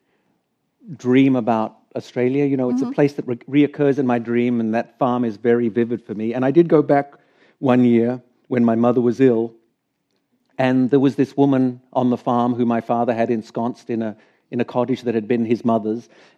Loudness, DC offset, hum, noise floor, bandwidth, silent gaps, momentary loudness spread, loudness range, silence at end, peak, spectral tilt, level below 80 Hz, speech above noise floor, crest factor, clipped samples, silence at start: -19 LUFS; under 0.1%; none; -71 dBFS; 7.2 kHz; none; 10 LU; 3 LU; 0.35 s; -2 dBFS; -8.5 dB/octave; -76 dBFS; 53 dB; 18 dB; under 0.1%; 0.85 s